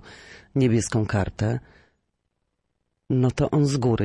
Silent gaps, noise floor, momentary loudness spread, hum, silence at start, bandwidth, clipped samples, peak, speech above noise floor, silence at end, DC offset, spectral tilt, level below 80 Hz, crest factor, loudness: none; -76 dBFS; 8 LU; none; 0.05 s; 11.5 kHz; under 0.1%; -10 dBFS; 54 dB; 0 s; under 0.1%; -6.5 dB/octave; -48 dBFS; 14 dB; -24 LUFS